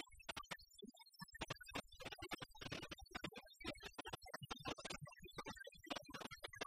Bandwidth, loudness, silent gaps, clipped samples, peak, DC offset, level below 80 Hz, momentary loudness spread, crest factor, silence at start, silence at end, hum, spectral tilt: 15.5 kHz; -52 LUFS; none; under 0.1%; -30 dBFS; under 0.1%; -68 dBFS; 5 LU; 22 dB; 0 s; 0 s; none; -3.5 dB/octave